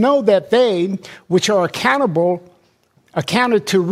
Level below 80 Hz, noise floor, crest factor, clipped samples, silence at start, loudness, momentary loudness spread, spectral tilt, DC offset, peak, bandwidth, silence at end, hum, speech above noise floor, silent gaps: -60 dBFS; -57 dBFS; 14 dB; under 0.1%; 0 s; -16 LUFS; 10 LU; -5 dB/octave; under 0.1%; -2 dBFS; 16 kHz; 0 s; none; 42 dB; none